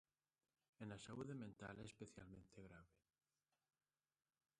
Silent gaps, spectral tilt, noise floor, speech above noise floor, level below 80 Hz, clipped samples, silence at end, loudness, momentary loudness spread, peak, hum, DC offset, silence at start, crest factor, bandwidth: none; -5.5 dB/octave; under -90 dBFS; over 33 dB; -80 dBFS; under 0.1%; 1.7 s; -58 LUFS; 10 LU; -40 dBFS; none; under 0.1%; 0.8 s; 20 dB; 11 kHz